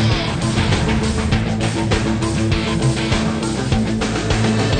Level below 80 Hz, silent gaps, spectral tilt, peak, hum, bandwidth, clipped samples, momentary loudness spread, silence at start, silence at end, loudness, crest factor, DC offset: -28 dBFS; none; -5.5 dB/octave; -6 dBFS; none; 9.6 kHz; under 0.1%; 2 LU; 0 s; 0 s; -18 LUFS; 12 dB; under 0.1%